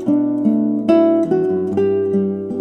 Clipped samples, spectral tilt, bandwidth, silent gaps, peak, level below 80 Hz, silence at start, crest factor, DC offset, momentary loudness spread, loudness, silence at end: under 0.1%; -9.5 dB/octave; 6 kHz; none; -2 dBFS; -60 dBFS; 0 s; 14 dB; under 0.1%; 5 LU; -16 LUFS; 0 s